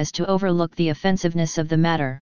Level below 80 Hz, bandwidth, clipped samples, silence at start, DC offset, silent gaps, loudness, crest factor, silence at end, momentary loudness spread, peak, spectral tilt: -48 dBFS; 7.2 kHz; under 0.1%; 0 s; 2%; none; -22 LUFS; 16 dB; 0.05 s; 2 LU; -6 dBFS; -6 dB/octave